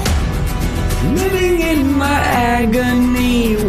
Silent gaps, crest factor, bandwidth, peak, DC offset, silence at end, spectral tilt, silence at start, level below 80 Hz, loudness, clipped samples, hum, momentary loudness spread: none; 12 dB; 15 kHz; -4 dBFS; under 0.1%; 0 s; -5.5 dB/octave; 0 s; -22 dBFS; -15 LUFS; under 0.1%; none; 5 LU